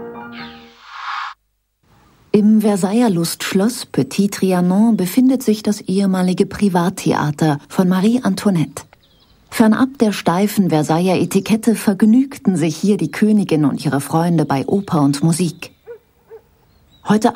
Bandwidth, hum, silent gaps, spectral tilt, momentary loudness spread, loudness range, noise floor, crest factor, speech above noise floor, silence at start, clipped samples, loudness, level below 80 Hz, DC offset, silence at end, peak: 16 kHz; none; none; -6 dB/octave; 12 LU; 3 LU; -66 dBFS; 14 dB; 51 dB; 0 s; under 0.1%; -16 LUFS; -56 dBFS; under 0.1%; 0 s; -2 dBFS